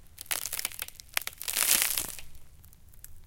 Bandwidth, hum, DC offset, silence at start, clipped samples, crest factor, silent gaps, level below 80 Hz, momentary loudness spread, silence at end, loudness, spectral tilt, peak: 17.5 kHz; none; under 0.1%; 0 s; under 0.1%; 32 dB; none; -54 dBFS; 15 LU; 0 s; -29 LUFS; 1 dB/octave; 0 dBFS